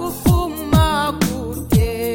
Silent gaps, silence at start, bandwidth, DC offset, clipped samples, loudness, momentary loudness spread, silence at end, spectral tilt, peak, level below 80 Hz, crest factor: none; 0 s; 17 kHz; under 0.1%; under 0.1%; -18 LUFS; 5 LU; 0 s; -6 dB/octave; -2 dBFS; -26 dBFS; 16 dB